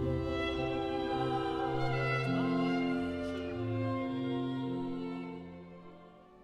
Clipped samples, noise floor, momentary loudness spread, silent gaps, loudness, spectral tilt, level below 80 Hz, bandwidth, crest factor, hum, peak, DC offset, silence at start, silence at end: under 0.1%; -55 dBFS; 13 LU; none; -34 LUFS; -7.5 dB/octave; -54 dBFS; 10.5 kHz; 14 dB; none; -20 dBFS; under 0.1%; 0 s; 0 s